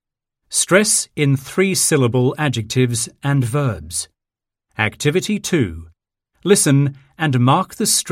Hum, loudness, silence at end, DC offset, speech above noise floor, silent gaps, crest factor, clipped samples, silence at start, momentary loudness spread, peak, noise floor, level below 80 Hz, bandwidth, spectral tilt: none; -17 LUFS; 0 s; under 0.1%; 68 dB; none; 18 dB; under 0.1%; 0.5 s; 11 LU; 0 dBFS; -85 dBFS; -48 dBFS; 16 kHz; -4.5 dB/octave